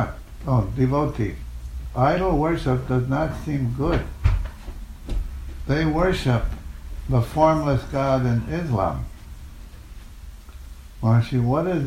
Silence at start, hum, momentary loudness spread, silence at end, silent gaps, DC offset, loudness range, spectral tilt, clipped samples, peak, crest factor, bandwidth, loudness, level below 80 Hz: 0 s; none; 23 LU; 0 s; none; under 0.1%; 4 LU; -8 dB/octave; under 0.1%; -6 dBFS; 18 dB; 14.5 kHz; -23 LUFS; -32 dBFS